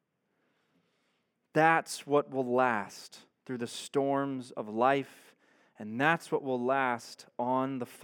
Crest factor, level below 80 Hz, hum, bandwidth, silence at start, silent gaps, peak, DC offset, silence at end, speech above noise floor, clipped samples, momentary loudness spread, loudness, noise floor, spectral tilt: 22 dB; under -90 dBFS; none; 18 kHz; 1.55 s; none; -10 dBFS; under 0.1%; 0 s; 47 dB; under 0.1%; 15 LU; -30 LUFS; -78 dBFS; -5 dB/octave